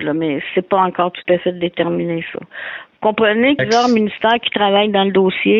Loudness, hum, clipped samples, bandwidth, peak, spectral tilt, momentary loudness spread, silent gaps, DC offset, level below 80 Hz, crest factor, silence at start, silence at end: -16 LUFS; none; under 0.1%; 7.4 kHz; -2 dBFS; -5.5 dB/octave; 10 LU; none; under 0.1%; -58 dBFS; 14 dB; 0 s; 0 s